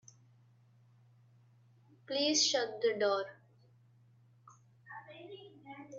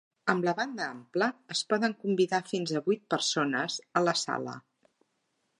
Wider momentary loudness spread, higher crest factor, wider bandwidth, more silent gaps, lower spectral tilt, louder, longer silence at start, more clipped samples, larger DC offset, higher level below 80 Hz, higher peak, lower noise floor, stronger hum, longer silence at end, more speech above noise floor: first, 24 LU vs 6 LU; about the same, 20 dB vs 24 dB; second, 8.4 kHz vs 11.5 kHz; neither; second, -1.5 dB/octave vs -4 dB/octave; about the same, -32 LUFS vs -30 LUFS; first, 2.1 s vs 0.25 s; neither; neither; second, -88 dBFS vs -80 dBFS; second, -18 dBFS vs -8 dBFS; second, -65 dBFS vs -77 dBFS; neither; second, 0 s vs 1 s; second, 33 dB vs 48 dB